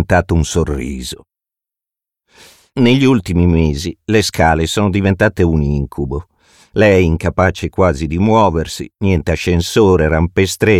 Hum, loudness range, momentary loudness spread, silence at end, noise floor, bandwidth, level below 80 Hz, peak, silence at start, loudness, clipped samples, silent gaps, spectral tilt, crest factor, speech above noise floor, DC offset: none; 3 LU; 11 LU; 0 s; -86 dBFS; 15.5 kHz; -28 dBFS; 0 dBFS; 0 s; -14 LUFS; under 0.1%; none; -6 dB/octave; 14 dB; 73 dB; under 0.1%